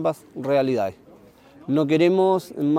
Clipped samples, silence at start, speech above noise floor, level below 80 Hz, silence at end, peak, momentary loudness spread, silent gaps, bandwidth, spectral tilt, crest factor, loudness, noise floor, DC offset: under 0.1%; 0 s; 29 dB; -66 dBFS; 0 s; -8 dBFS; 12 LU; none; 15.5 kHz; -7.5 dB/octave; 14 dB; -22 LUFS; -50 dBFS; under 0.1%